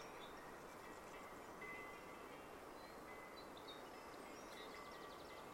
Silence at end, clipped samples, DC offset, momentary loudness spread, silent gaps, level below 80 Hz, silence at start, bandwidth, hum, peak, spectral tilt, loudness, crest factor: 0 s; under 0.1%; under 0.1%; 3 LU; none; -74 dBFS; 0 s; 16 kHz; none; -42 dBFS; -3.5 dB/octave; -55 LUFS; 14 dB